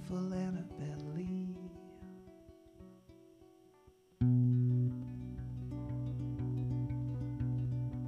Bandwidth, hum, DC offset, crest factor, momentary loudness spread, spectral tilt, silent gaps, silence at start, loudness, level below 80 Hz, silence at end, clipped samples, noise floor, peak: 6.6 kHz; none; under 0.1%; 16 dB; 23 LU; -10 dB/octave; none; 0 s; -37 LUFS; -54 dBFS; 0 s; under 0.1%; -64 dBFS; -22 dBFS